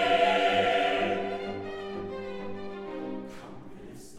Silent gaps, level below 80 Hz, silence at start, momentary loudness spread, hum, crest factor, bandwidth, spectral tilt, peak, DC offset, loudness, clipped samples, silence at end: none; -56 dBFS; 0 s; 22 LU; none; 18 dB; 12.5 kHz; -4.5 dB/octave; -12 dBFS; under 0.1%; -29 LUFS; under 0.1%; 0 s